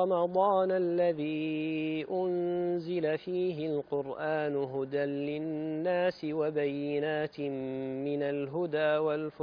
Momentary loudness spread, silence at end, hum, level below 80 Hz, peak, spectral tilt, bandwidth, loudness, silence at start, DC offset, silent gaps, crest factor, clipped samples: 6 LU; 0 s; none; -72 dBFS; -16 dBFS; -5.5 dB/octave; 5.2 kHz; -32 LUFS; 0 s; under 0.1%; none; 16 dB; under 0.1%